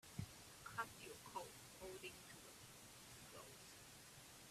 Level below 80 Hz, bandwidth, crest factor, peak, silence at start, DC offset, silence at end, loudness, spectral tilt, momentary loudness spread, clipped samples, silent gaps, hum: -76 dBFS; 15.5 kHz; 24 dB; -32 dBFS; 0.05 s; under 0.1%; 0 s; -56 LUFS; -3 dB/octave; 9 LU; under 0.1%; none; none